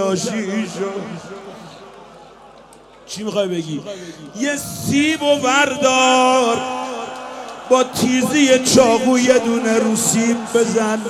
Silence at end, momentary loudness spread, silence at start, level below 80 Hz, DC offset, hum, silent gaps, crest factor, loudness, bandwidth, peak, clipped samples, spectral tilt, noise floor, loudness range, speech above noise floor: 0 s; 19 LU; 0 s; -56 dBFS; under 0.1%; none; none; 16 dB; -16 LUFS; 16 kHz; 0 dBFS; under 0.1%; -3.5 dB/octave; -44 dBFS; 13 LU; 27 dB